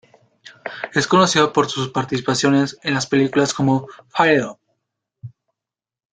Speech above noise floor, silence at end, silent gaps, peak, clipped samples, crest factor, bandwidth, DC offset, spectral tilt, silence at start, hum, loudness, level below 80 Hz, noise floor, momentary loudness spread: 70 dB; 0.85 s; none; -2 dBFS; under 0.1%; 18 dB; 9.4 kHz; under 0.1%; -4.5 dB/octave; 0.45 s; none; -18 LUFS; -58 dBFS; -88 dBFS; 12 LU